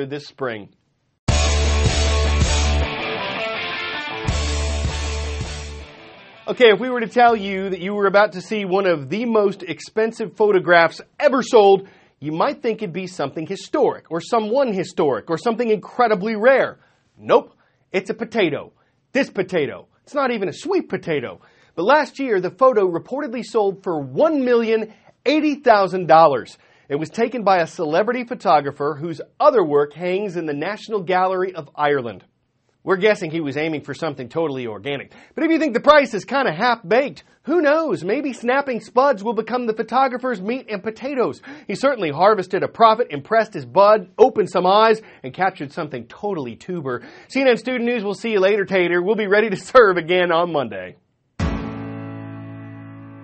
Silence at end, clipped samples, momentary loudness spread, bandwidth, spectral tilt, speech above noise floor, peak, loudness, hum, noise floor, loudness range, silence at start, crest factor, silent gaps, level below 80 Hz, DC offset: 0 s; under 0.1%; 14 LU; 8.8 kHz; -5.5 dB/octave; 48 dB; 0 dBFS; -19 LUFS; none; -66 dBFS; 5 LU; 0 s; 20 dB; 1.19-1.27 s; -34 dBFS; under 0.1%